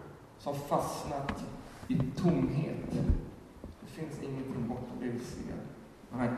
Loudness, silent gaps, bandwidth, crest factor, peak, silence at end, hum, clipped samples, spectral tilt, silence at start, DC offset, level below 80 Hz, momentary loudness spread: -35 LUFS; none; 13.5 kHz; 18 dB; -16 dBFS; 0 s; none; under 0.1%; -7 dB/octave; 0 s; under 0.1%; -46 dBFS; 18 LU